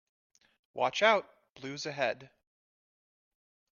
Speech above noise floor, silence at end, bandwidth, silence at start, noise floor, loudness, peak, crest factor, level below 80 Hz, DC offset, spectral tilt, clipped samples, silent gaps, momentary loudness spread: over 59 dB; 1.45 s; 7.2 kHz; 0.75 s; under -90 dBFS; -30 LUFS; -12 dBFS; 24 dB; -82 dBFS; under 0.1%; -3 dB/octave; under 0.1%; 1.50-1.55 s; 19 LU